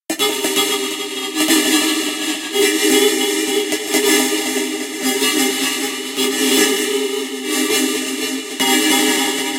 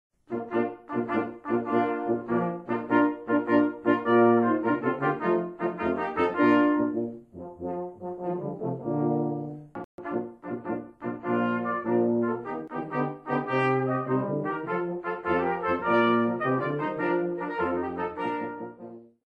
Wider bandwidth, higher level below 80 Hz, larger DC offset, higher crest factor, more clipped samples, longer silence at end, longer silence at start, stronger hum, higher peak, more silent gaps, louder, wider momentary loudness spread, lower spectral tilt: first, 17 kHz vs 5.2 kHz; second, -70 dBFS vs -64 dBFS; neither; about the same, 16 dB vs 18 dB; neither; second, 0 s vs 0.2 s; second, 0.1 s vs 0.3 s; neither; first, -2 dBFS vs -8 dBFS; second, none vs 9.84-9.98 s; first, -16 LUFS vs -27 LUFS; second, 8 LU vs 13 LU; second, -0.5 dB/octave vs -9 dB/octave